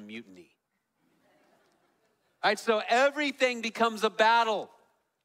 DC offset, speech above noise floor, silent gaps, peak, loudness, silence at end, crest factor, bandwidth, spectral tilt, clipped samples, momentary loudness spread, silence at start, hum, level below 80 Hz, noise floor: under 0.1%; 50 dB; none; -10 dBFS; -27 LUFS; 0.6 s; 20 dB; 16 kHz; -2.5 dB/octave; under 0.1%; 14 LU; 0 s; none; -82 dBFS; -78 dBFS